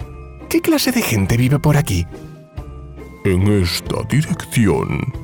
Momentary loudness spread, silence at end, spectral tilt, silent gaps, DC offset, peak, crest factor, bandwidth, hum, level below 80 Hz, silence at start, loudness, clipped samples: 20 LU; 0 s; -5.5 dB/octave; none; under 0.1%; -4 dBFS; 12 dB; over 20 kHz; none; -36 dBFS; 0 s; -17 LUFS; under 0.1%